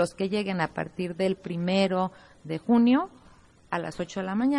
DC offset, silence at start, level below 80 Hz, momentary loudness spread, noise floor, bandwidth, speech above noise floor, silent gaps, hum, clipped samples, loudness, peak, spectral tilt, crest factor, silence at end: under 0.1%; 0 s; -62 dBFS; 12 LU; -55 dBFS; 11.5 kHz; 29 dB; none; none; under 0.1%; -27 LUFS; -12 dBFS; -6.5 dB/octave; 16 dB; 0 s